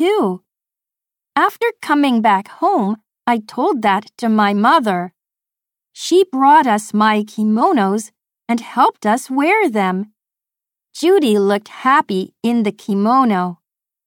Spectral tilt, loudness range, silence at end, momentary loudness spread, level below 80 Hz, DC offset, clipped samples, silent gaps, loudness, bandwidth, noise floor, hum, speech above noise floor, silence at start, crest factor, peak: -5.5 dB/octave; 3 LU; 0.5 s; 10 LU; -70 dBFS; under 0.1%; under 0.1%; none; -16 LUFS; 18 kHz; -87 dBFS; none; 72 dB; 0 s; 14 dB; -2 dBFS